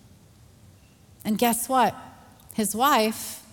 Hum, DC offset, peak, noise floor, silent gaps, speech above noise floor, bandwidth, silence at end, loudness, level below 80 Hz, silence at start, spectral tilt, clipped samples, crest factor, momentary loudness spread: none; under 0.1%; -6 dBFS; -54 dBFS; none; 30 dB; 18 kHz; 0.1 s; -24 LUFS; -62 dBFS; 1.25 s; -3 dB/octave; under 0.1%; 20 dB; 15 LU